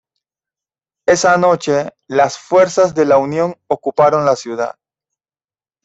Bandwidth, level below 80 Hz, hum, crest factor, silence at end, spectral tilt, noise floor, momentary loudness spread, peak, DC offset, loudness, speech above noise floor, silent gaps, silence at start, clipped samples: 8 kHz; -58 dBFS; none; 14 dB; 1.15 s; -4.5 dB/octave; under -90 dBFS; 9 LU; -2 dBFS; under 0.1%; -15 LUFS; over 76 dB; none; 1.1 s; under 0.1%